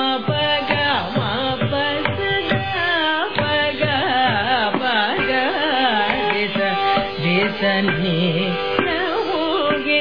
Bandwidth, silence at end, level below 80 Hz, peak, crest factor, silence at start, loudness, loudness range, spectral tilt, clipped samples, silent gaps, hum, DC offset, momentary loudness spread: 5.4 kHz; 0 s; -48 dBFS; -2 dBFS; 18 dB; 0 s; -19 LUFS; 1 LU; -7 dB/octave; under 0.1%; none; none; 0.9%; 3 LU